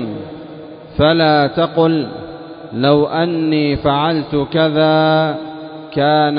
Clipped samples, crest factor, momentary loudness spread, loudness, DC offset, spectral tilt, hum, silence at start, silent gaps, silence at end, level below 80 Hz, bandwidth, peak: under 0.1%; 14 dB; 18 LU; -15 LUFS; under 0.1%; -12 dB/octave; none; 0 s; none; 0 s; -42 dBFS; 5.2 kHz; -2 dBFS